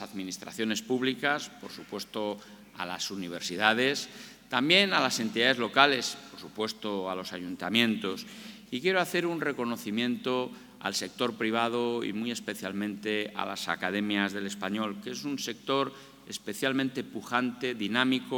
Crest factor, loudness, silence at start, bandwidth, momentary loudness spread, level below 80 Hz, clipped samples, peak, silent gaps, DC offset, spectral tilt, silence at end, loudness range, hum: 28 dB; -30 LUFS; 0 s; 19 kHz; 14 LU; -72 dBFS; under 0.1%; -4 dBFS; none; under 0.1%; -3.5 dB/octave; 0 s; 6 LU; none